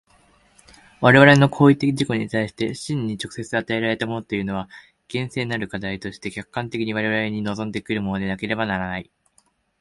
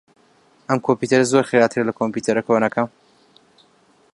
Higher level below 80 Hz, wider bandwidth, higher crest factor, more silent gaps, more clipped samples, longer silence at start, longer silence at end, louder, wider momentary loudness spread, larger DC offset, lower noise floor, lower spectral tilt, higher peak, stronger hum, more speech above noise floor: first, -52 dBFS vs -64 dBFS; about the same, 11.5 kHz vs 11.5 kHz; about the same, 22 dB vs 18 dB; neither; neither; first, 1 s vs 0.7 s; second, 0.8 s vs 1.25 s; about the same, -21 LUFS vs -19 LUFS; first, 15 LU vs 8 LU; neither; first, -63 dBFS vs -57 dBFS; about the same, -6 dB/octave vs -5.5 dB/octave; about the same, 0 dBFS vs -2 dBFS; neither; about the same, 42 dB vs 39 dB